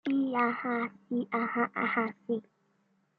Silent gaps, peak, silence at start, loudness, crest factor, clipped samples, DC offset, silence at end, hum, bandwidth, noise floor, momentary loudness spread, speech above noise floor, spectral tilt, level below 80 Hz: none; -14 dBFS; 0.05 s; -31 LUFS; 18 dB; under 0.1%; under 0.1%; 0.8 s; none; 4.9 kHz; -72 dBFS; 7 LU; 41 dB; -8.5 dB/octave; -84 dBFS